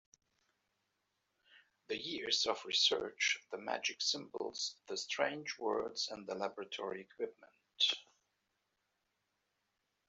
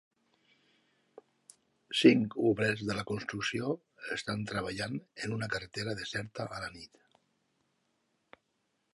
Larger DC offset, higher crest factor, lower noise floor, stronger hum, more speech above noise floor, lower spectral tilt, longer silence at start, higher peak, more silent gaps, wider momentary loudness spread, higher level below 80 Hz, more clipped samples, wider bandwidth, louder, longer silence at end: neither; about the same, 24 dB vs 26 dB; first, -85 dBFS vs -79 dBFS; neither; about the same, 46 dB vs 47 dB; second, -1 dB/octave vs -5 dB/octave; second, 1.55 s vs 1.9 s; second, -18 dBFS vs -10 dBFS; neither; second, 11 LU vs 15 LU; second, -84 dBFS vs -66 dBFS; neither; second, 8.2 kHz vs 11.5 kHz; second, -37 LUFS vs -33 LUFS; about the same, 2.05 s vs 2.1 s